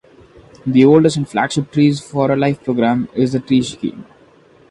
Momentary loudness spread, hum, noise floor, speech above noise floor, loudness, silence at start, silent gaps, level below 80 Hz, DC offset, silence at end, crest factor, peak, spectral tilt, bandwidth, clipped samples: 10 LU; none; -48 dBFS; 33 dB; -16 LUFS; 0.65 s; none; -52 dBFS; under 0.1%; 0.65 s; 16 dB; 0 dBFS; -6.5 dB/octave; 11 kHz; under 0.1%